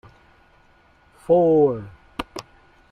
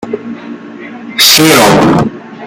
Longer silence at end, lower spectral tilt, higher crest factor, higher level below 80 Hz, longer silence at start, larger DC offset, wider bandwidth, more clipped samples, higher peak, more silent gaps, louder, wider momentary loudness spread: first, 0.5 s vs 0 s; first, -7.5 dB/octave vs -3 dB/octave; first, 18 dB vs 10 dB; second, -54 dBFS vs -40 dBFS; first, 1.3 s vs 0 s; neither; second, 11.5 kHz vs over 20 kHz; second, under 0.1% vs 0.6%; second, -6 dBFS vs 0 dBFS; neither; second, -20 LUFS vs -6 LUFS; about the same, 21 LU vs 22 LU